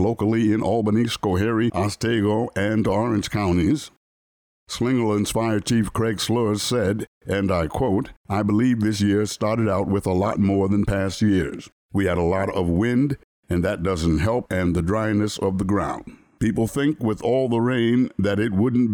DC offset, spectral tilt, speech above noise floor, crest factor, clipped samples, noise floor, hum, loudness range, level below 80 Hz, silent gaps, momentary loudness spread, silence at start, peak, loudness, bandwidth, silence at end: under 0.1%; -6.5 dB/octave; over 69 dB; 10 dB; under 0.1%; under -90 dBFS; none; 2 LU; -42 dBFS; 3.97-4.67 s, 7.07-7.21 s, 8.17-8.24 s, 11.72-11.89 s, 13.24-13.43 s; 5 LU; 0 s; -10 dBFS; -22 LUFS; over 20 kHz; 0 s